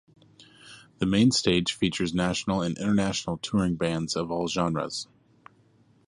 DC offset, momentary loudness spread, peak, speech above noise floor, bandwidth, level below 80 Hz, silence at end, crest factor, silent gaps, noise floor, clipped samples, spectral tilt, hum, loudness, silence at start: under 0.1%; 9 LU; -8 dBFS; 35 dB; 11 kHz; -52 dBFS; 1.05 s; 18 dB; none; -61 dBFS; under 0.1%; -5 dB/octave; none; -26 LUFS; 0.65 s